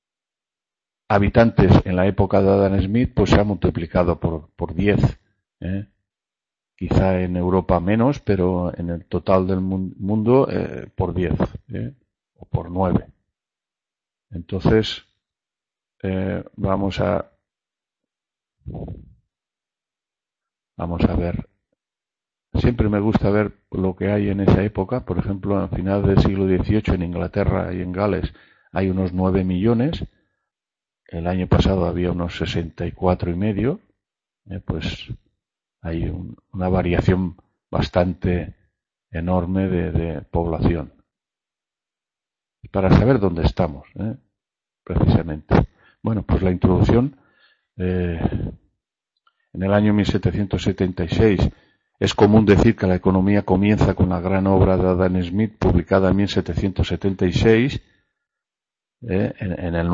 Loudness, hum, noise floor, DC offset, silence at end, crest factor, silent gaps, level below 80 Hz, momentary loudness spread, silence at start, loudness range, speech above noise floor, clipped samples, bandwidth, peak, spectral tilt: -20 LUFS; none; -90 dBFS; under 0.1%; 0 s; 20 dB; none; -34 dBFS; 13 LU; 1.1 s; 9 LU; 71 dB; under 0.1%; 7.6 kHz; 0 dBFS; -8 dB/octave